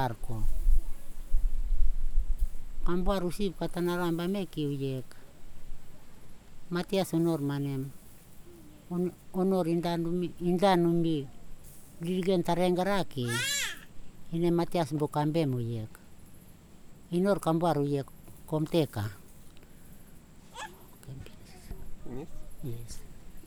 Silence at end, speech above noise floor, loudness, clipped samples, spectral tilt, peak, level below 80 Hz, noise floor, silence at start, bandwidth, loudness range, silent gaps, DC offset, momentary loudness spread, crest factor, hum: 0 s; 22 dB; -31 LUFS; under 0.1%; -6 dB/octave; -10 dBFS; -34 dBFS; -51 dBFS; 0 s; 15 kHz; 7 LU; none; under 0.1%; 20 LU; 18 dB; none